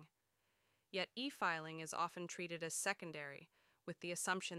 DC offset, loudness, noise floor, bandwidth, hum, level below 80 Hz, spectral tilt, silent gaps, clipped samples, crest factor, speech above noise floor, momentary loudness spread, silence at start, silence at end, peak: under 0.1%; -43 LUFS; -84 dBFS; 15.5 kHz; none; under -90 dBFS; -2.5 dB/octave; none; under 0.1%; 22 dB; 40 dB; 11 LU; 0 s; 0 s; -22 dBFS